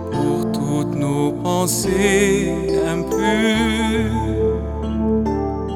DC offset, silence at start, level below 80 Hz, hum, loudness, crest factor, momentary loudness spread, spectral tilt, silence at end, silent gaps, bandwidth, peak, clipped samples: under 0.1%; 0 s; -32 dBFS; none; -19 LUFS; 14 dB; 5 LU; -5 dB/octave; 0 s; none; 17.5 kHz; -4 dBFS; under 0.1%